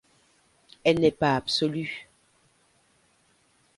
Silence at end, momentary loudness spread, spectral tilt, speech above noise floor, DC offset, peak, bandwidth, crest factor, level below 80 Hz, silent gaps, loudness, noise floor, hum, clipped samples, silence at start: 1.75 s; 12 LU; -5.5 dB/octave; 41 dB; under 0.1%; -6 dBFS; 11.5 kHz; 22 dB; -60 dBFS; none; -25 LUFS; -65 dBFS; none; under 0.1%; 0.85 s